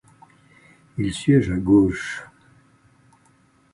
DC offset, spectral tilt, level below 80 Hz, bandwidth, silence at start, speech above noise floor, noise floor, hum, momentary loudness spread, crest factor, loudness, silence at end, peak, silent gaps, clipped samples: under 0.1%; -7 dB/octave; -44 dBFS; 11 kHz; 0.95 s; 39 dB; -59 dBFS; none; 16 LU; 18 dB; -20 LUFS; 1.5 s; -4 dBFS; none; under 0.1%